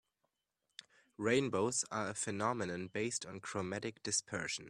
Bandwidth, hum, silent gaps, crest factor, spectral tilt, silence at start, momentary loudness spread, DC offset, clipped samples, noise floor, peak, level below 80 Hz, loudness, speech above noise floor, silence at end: 13 kHz; none; none; 20 dB; -3.5 dB/octave; 1.2 s; 13 LU; under 0.1%; under 0.1%; -86 dBFS; -18 dBFS; -74 dBFS; -37 LUFS; 49 dB; 0 s